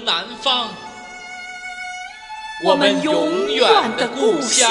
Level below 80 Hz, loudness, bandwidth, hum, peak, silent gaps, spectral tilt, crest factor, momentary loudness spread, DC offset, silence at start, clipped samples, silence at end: -58 dBFS; -17 LUFS; 11.5 kHz; none; 0 dBFS; none; -1.5 dB/octave; 18 dB; 18 LU; under 0.1%; 0 s; under 0.1%; 0 s